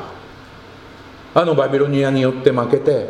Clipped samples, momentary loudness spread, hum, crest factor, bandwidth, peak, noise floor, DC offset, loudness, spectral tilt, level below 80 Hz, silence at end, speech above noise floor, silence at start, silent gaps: under 0.1%; 7 LU; none; 18 dB; 10 kHz; 0 dBFS; -39 dBFS; under 0.1%; -16 LUFS; -7.5 dB/octave; -52 dBFS; 0 s; 24 dB; 0 s; none